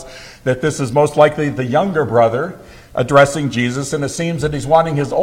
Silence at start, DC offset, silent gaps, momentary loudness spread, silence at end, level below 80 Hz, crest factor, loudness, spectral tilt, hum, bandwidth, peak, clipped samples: 0 s; under 0.1%; none; 10 LU; 0 s; -42 dBFS; 16 dB; -16 LUFS; -5.5 dB/octave; none; 15.5 kHz; 0 dBFS; under 0.1%